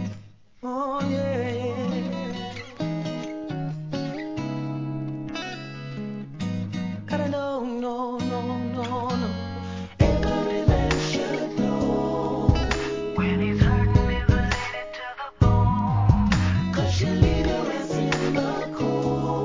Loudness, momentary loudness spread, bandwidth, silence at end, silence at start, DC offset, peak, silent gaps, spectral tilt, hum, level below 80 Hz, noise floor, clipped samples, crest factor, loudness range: -25 LUFS; 11 LU; 7.6 kHz; 0 s; 0 s; 0.2%; -4 dBFS; none; -7 dB/octave; none; -32 dBFS; -46 dBFS; under 0.1%; 20 dB; 8 LU